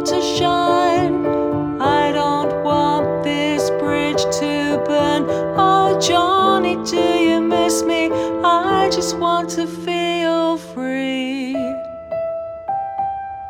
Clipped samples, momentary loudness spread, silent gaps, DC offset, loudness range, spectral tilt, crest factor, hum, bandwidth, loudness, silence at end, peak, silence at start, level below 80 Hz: under 0.1%; 9 LU; none; under 0.1%; 5 LU; -4.5 dB/octave; 14 dB; none; 16.5 kHz; -18 LUFS; 0 s; -2 dBFS; 0 s; -48 dBFS